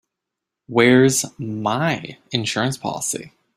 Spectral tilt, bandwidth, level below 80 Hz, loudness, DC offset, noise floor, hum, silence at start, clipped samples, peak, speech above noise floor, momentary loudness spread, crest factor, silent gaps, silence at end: -4 dB/octave; 16 kHz; -58 dBFS; -20 LUFS; under 0.1%; -83 dBFS; none; 0.7 s; under 0.1%; -2 dBFS; 64 dB; 13 LU; 20 dB; none; 0.3 s